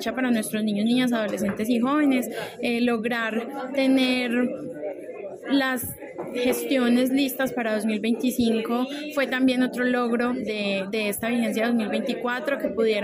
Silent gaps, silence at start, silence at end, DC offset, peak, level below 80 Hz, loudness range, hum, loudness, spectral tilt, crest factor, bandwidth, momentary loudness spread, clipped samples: none; 0 s; 0 s; under 0.1%; -10 dBFS; -62 dBFS; 2 LU; none; -24 LUFS; -4.5 dB/octave; 14 dB; 16 kHz; 8 LU; under 0.1%